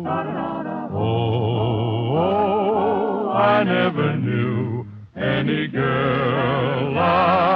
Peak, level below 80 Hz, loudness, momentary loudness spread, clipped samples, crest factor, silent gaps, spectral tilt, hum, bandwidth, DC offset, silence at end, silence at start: -6 dBFS; -50 dBFS; -20 LUFS; 9 LU; under 0.1%; 14 dB; none; -9.5 dB/octave; none; 5.4 kHz; under 0.1%; 0 s; 0 s